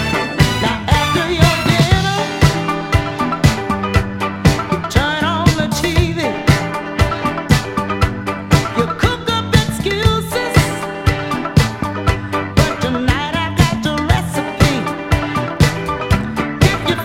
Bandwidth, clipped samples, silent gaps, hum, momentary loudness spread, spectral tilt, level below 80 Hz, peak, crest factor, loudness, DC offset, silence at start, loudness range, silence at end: 16.5 kHz; 0.1%; none; none; 5 LU; -5.5 dB/octave; -26 dBFS; 0 dBFS; 16 dB; -16 LUFS; under 0.1%; 0 s; 2 LU; 0 s